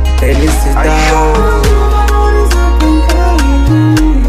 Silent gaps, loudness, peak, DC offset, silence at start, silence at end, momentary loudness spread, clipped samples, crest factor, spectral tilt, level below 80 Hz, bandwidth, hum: none; -10 LUFS; 0 dBFS; 0.4%; 0 s; 0 s; 2 LU; under 0.1%; 8 dB; -6 dB/octave; -10 dBFS; 14.5 kHz; none